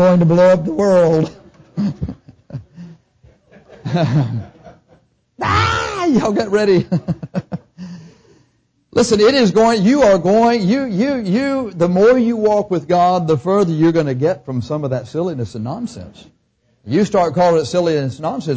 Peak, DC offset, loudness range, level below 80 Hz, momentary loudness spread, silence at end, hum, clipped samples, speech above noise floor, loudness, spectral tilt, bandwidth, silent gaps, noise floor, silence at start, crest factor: -4 dBFS; under 0.1%; 8 LU; -44 dBFS; 16 LU; 0 s; none; under 0.1%; 46 dB; -15 LUFS; -6.5 dB/octave; 8 kHz; none; -61 dBFS; 0 s; 12 dB